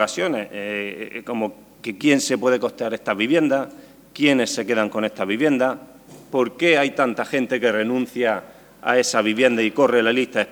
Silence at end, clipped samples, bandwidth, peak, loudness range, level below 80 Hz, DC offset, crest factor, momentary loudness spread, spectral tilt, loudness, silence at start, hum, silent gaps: 0 s; under 0.1%; over 20 kHz; -2 dBFS; 2 LU; -66 dBFS; under 0.1%; 18 dB; 11 LU; -4 dB/octave; -20 LUFS; 0 s; none; none